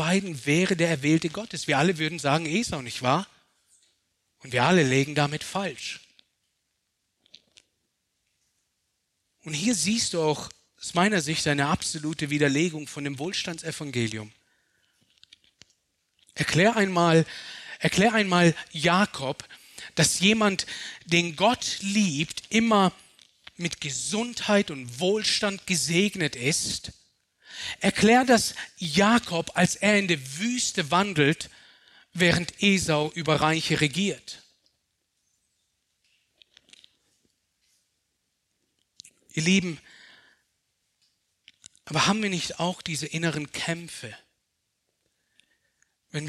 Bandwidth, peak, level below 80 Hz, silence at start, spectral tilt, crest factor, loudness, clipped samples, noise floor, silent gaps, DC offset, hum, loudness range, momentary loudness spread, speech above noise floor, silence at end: 13.5 kHz; -6 dBFS; -60 dBFS; 0 s; -4 dB/octave; 20 dB; -24 LUFS; under 0.1%; -78 dBFS; none; under 0.1%; none; 9 LU; 13 LU; 53 dB; 0 s